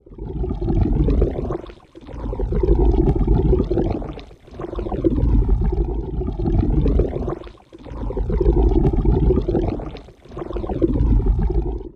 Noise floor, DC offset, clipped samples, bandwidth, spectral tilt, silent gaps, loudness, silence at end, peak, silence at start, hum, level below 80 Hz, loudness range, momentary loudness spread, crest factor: -39 dBFS; under 0.1%; under 0.1%; 4.4 kHz; -11 dB/octave; none; -21 LUFS; 0.1 s; -2 dBFS; 0.1 s; none; -22 dBFS; 2 LU; 16 LU; 16 dB